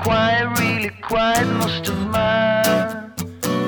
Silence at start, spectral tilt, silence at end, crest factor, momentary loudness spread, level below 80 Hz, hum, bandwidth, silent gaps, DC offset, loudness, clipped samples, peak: 0 s; -4.5 dB/octave; 0 s; 18 dB; 9 LU; -42 dBFS; none; over 20 kHz; none; under 0.1%; -19 LUFS; under 0.1%; -2 dBFS